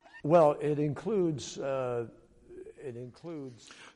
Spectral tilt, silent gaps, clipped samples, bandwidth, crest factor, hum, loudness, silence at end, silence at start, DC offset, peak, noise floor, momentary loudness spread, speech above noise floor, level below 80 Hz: -7 dB/octave; none; under 0.1%; 11 kHz; 18 dB; none; -29 LUFS; 0.05 s; 0.15 s; under 0.1%; -12 dBFS; -50 dBFS; 22 LU; 20 dB; -66 dBFS